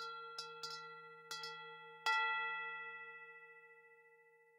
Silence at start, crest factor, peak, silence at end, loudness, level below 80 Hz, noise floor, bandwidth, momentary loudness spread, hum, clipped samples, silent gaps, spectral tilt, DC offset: 0 s; 22 dB; -24 dBFS; 0 s; -43 LUFS; under -90 dBFS; -68 dBFS; 16 kHz; 22 LU; none; under 0.1%; none; 0.5 dB/octave; under 0.1%